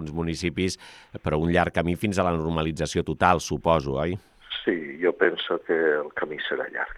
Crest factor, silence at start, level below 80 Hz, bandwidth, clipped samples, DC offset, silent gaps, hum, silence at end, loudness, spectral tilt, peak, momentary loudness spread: 20 dB; 0 s; -48 dBFS; 14.5 kHz; under 0.1%; under 0.1%; none; none; 0 s; -25 LUFS; -5.5 dB/octave; -4 dBFS; 8 LU